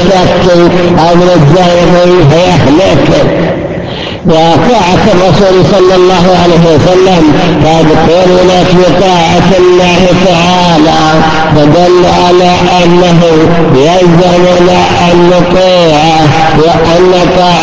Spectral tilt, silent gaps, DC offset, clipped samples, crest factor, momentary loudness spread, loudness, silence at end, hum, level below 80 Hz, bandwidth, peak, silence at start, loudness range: -6 dB/octave; none; 9%; 7%; 4 dB; 2 LU; -5 LUFS; 0 s; none; -26 dBFS; 8 kHz; 0 dBFS; 0 s; 1 LU